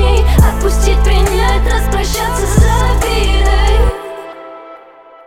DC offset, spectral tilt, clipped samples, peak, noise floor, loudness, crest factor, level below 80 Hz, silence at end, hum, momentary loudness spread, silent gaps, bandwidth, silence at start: under 0.1%; -5 dB/octave; under 0.1%; 0 dBFS; -38 dBFS; -13 LUFS; 12 dB; -12 dBFS; 0.5 s; none; 17 LU; none; 15.5 kHz; 0 s